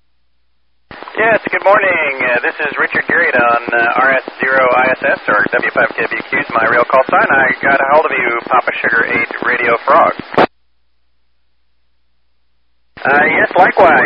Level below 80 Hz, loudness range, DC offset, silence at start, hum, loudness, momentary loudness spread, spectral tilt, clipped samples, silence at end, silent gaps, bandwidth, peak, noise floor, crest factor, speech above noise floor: -52 dBFS; 4 LU; 0.2%; 0.9 s; none; -12 LUFS; 5 LU; -7 dB/octave; under 0.1%; 0 s; none; 5.6 kHz; 0 dBFS; -65 dBFS; 14 dB; 53 dB